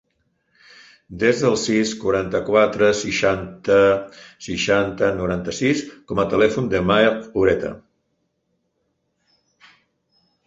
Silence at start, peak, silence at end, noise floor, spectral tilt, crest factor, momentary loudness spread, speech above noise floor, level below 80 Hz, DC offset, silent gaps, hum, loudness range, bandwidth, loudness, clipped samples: 1.1 s; -2 dBFS; 2.7 s; -71 dBFS; -5 dB/octave; 20 dB; 9 LU; 52 dB; -48 dBFS; under 0.1%; none; none; 4 LU; 8 kHz; -19 LUFS; under 0.1%